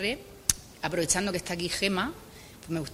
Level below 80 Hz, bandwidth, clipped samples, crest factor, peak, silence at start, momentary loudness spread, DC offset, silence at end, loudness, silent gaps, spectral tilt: -52 dBFS; 16 kHz; under 0.1%; 32 dB; 0 dBFS; 0 s; 15 LU; under 0.1%; 0 s; -29 LUFS; none; -2.5 dB/octave